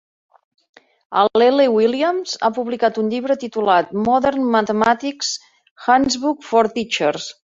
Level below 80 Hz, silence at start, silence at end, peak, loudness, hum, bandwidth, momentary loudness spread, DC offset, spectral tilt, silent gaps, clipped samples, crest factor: -56 dBFS; 1.1 s; 0.25 s; -2 dBFS; -18 LUFS; none; 7.8 kHz; 8 LU; under 0.1%; -4 dB/octave; 5.71-5.76 s; under 0.1%; 18 dB